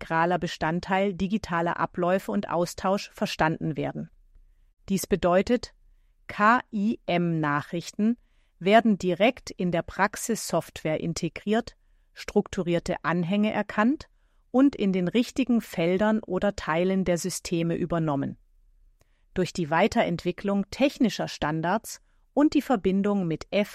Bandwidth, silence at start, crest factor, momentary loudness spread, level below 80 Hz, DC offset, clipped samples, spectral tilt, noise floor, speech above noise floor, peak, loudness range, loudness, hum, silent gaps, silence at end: 15 kHz; 0 s; 20 dB; 8 LU; -52 dBFS; under 0.1%; under 0.1%; -5.5 dB/octave; -61 dBFS; 35 dB; -6 dBFS; 3 LU; -26 LUFS; none; none; 0 s